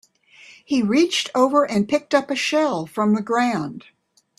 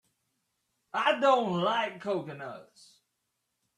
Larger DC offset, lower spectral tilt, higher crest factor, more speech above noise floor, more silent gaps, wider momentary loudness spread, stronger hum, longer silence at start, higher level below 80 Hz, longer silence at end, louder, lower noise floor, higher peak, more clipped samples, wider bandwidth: neither; about the same, -4.5 dB/octave vs -5.5 dB/octave; about the same, 18 dB vs 20 dB; second, 29 dB vs 52 dB; neither; second, 6 LU vs 18 LU; neither; second, 0.5 s vs 0.95 s; first, -64 dBFS vs -78 dBFS; second, 0.6 s vs 1.15 s; first, -20 LUFS vs -28 LUFS; second, -49 dBFS vs -81 dBFS; first, -4 dBFS vs -12 dBFS; neither; first, 13 kHz vs 11.5 kHz